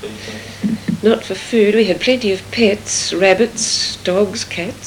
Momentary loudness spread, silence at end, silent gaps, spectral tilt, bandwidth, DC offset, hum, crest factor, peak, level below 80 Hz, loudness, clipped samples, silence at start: 9 LU; 0 s; none; -3.5 dB/octave; 18 kHz; under 0.1%; none; 16 dB; 0 dBFS; -48 dBFS; -16 LUFS; under 0.1%; 0 s